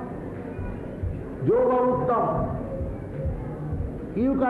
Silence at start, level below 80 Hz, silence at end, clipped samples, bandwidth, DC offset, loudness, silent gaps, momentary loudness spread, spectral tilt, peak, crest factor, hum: 0 s; -38 dBFS; 0 s; under 0.1%; 4.5 kHz; under 0.1%; -27 LUFS; none; 13 LU; -10.5 dB/octave; -12 dBFS; 14 dB; none